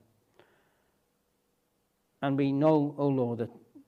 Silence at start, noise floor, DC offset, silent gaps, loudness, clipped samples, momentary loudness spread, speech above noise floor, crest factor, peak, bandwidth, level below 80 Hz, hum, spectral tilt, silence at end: 2.2 s; -75 dBFS; under 0.1%; none; -29 LUFS; under 0.1%; 11 LU; 48 dB; 20 dB; -12 dBFS; 5 kHz; -76 dBFS; none; -10 dB/octave; 0.35 s